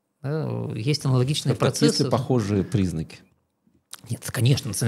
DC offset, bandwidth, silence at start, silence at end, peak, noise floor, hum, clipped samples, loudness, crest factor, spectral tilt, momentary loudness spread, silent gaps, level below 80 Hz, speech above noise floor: under 0.1%; 15 kHz; 0.25 s; 0 s; -4 dBFS; -66 dBFS; none; under 0.1%; -24 LUFS; 20 dB; -5.5 dB/octave; 13 LU; none; -54 dBFS; 43 dB